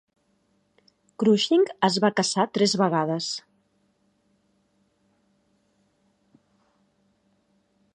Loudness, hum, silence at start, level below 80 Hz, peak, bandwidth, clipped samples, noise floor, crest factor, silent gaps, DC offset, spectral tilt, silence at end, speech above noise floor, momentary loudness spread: -23 LUFS; none; 1.2 s; -76 dBFS; -4 dBFS; 10.5 kHz; under 0.1%; -68 dBFS; 22 dB; none; under 0.1%; -4.5 dB/octave; 4.55 s; 46 dB; 8 LU